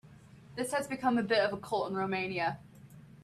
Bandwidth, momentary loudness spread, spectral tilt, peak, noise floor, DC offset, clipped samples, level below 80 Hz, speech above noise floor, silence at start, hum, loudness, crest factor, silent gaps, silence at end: 14 kHz; 9 LU; -4.5 dB/octave; -16 dBFS; -55 dBFS; under 0.1%; under 0.1%; -68 dBFS; 23 dB; 0.05 s; none; -32 LUFS; 18 dB; none; 0.05 s